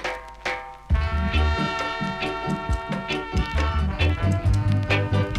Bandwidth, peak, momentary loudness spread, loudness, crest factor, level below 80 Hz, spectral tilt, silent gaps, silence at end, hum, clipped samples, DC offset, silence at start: 11 kHz; -8 dBFS; 8 LU; -25 LUFS; 16 dB; -28 dBFS; -6.5 dB/octave; none; 0 s; none; under 0.1%; under 0.1%; 0 s